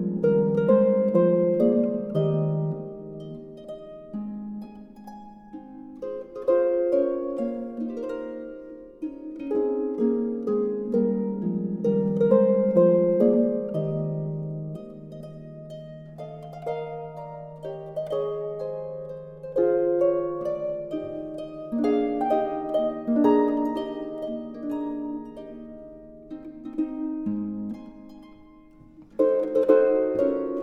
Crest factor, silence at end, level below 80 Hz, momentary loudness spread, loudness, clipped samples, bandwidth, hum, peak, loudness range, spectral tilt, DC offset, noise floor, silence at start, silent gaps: 20 dB; 0 s; -60 dBFS; 20 LU; -25 LUFS; under 0.1%; 5.4 kHz; none; -6 dBFS; 12 LU; -10 dB/octave; under 0.1%; -50 dBFS; 0 s; none